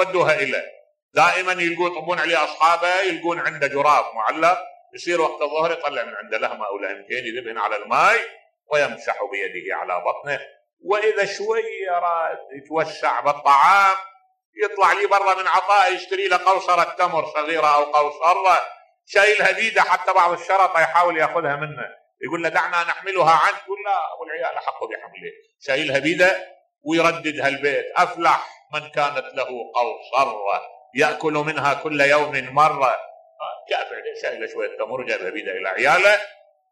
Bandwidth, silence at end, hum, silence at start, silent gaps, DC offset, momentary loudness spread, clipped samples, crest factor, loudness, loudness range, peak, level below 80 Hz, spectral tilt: 13.5 kHz; 0.4 s; none; 0 s; 1.02-1.09 s, 10.73-10.77 s, 14.45-14.53 s; under 0.1%; 12 LU; under 0.1%; 16 dB; -20 LUFS; 6 LU; -4 dBFS; -70 dBFS; -3.5 dB/octave